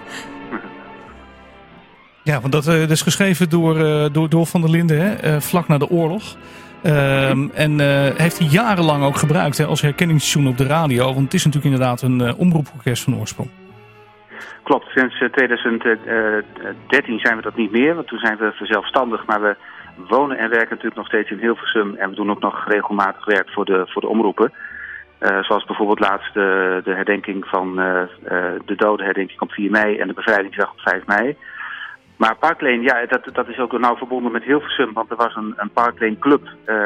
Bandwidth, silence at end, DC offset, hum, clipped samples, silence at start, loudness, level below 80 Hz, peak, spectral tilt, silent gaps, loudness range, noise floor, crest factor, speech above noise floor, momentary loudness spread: 16 kHz; 0 s; under 0.1%; none; under 0.1%; 0 s; -18 LUFS; -54 dBFS; -2 dBFS; -5.5 dB/octave; none; 4 LU; -46 dBFS; 16 dB; 29 dB; 10 LU